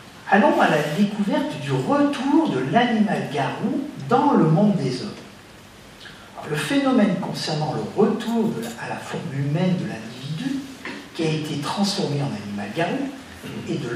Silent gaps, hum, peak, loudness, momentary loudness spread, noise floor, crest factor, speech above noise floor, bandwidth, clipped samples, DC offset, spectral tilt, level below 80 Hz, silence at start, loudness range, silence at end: none; none; -2 dBFS; -22 LUFS; 15 LU; -44 dBFS; 20 dB; 23 dB; 15 kHz; under 0.1%; under 0.1%; -6 dB/octave; -62 dBFS; 0 s; 6 LU; 0 s